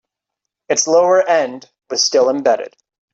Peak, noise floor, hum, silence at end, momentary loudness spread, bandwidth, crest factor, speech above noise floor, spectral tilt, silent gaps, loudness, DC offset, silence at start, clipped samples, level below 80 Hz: -2 dBFS; -80 dBFS; none; 0.45 s; 12 LU; 8 kHz; 16 dB; 66 dB; -1.5 dB/octave; none; -15 LUFS; under 0.1%; 0.7 s; under 0.1%; -66 dBFS